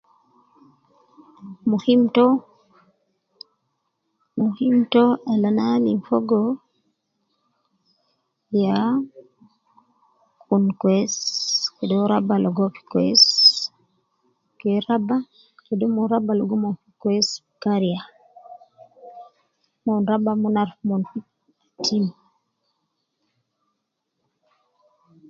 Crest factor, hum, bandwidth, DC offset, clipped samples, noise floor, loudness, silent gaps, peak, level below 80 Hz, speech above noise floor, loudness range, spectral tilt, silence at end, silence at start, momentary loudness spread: 20 dB; none; 7.6 kHz; under 0.1%; under 0.1%; -77 dBFS; -20 LUFS; none; -2 dBFS; -70 dBFS; 58 dB; 10 LU; -5 dB/octave; 3.2 s; 1.4 s; 11 LU